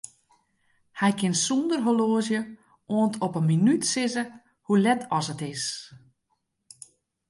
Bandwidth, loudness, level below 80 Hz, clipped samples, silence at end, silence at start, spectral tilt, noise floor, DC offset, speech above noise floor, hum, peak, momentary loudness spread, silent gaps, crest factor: 11.5 kHz; -25 LUFS; -72 dBFS; under 0.1%; 1.35 s; 0.95 s; -4.5 dB/octave; -76 dBFS; under 0.1%; 51 dB; none; -10 dBFS; 10 LU; none; 16 dB